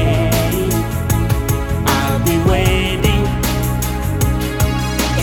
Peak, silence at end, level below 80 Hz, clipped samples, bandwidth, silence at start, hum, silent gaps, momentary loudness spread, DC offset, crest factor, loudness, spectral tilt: -2 dBFS; 0 s; -22 dBFS; under 0.1%; 20 kHz; 0 s; none; none; 4 LU; under 0.1%; 14 dB; -16 LUFS; -5 dB/octave